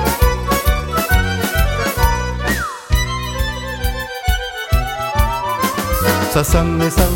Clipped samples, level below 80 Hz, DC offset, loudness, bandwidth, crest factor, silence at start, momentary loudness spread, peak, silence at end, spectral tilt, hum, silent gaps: under 0.1%; -20 dBFS; under 0.1%; -18 LUFS; 17 kHz; 16 dB; 0 s; 6 LU; 0 dBFS; 0 s; -4.5 dB/octave; none; none